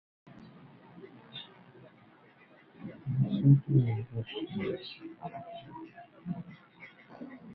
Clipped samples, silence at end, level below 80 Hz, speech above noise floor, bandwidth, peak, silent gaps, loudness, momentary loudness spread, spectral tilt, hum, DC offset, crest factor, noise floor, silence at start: under 0.1%; 0 s; -66 dBFS; 29 dB; 4.8 kHz; -10 dBFS; none; -31 LUFS; 28 LU; -11 dB/octave; none; under 0.1%; 24 dB; -59 dBFS; 0.25 s